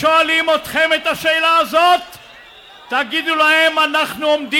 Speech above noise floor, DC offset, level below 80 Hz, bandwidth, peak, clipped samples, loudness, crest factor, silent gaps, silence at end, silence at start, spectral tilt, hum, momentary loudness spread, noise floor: 26 dB; under 0.1%; -56 dBFS; 17 kHz; -4 dBFS; under 0.1%; -14 LUFS; 12 dB; none; 0 s; 0 s; -2 dB/octave; none; 6 LU; -41 dBFS